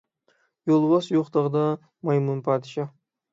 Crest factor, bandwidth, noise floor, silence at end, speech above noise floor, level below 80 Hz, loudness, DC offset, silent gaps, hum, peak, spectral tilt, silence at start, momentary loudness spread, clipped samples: 16 dB; 7.8 kHz; -68 dBFS; 0.45 s; 45 dB; -74 dBFS; -24 LUFS; under 0.1%; none; none; -8 dBFS; -8.5 dB/octave; 0.65 s; 13 LU; under 0.1%